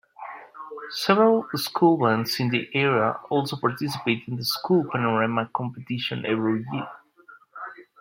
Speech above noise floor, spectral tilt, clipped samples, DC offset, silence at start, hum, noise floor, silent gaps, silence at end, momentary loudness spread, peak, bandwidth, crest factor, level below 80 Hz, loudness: 29 dB; -5.5 dB/octave; under 0.1%; under 0.1%; 0.2 s; none; -52 dBFS; none; 0.2 s; 20 LU; -2 dBFS; 16.5 kHz; 22 dB; -70 dBFS; -24 LUFS